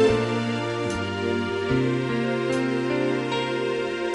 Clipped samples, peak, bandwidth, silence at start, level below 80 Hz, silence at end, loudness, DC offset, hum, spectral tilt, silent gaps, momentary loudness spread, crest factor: under 0.1%; -8 dBFS; 11.5 kHz; 0 s; -50 dBFS; 0 s; -25 LUFS; under 0.1%; none; -6 dB/octave; none; 3 LU; 16 dB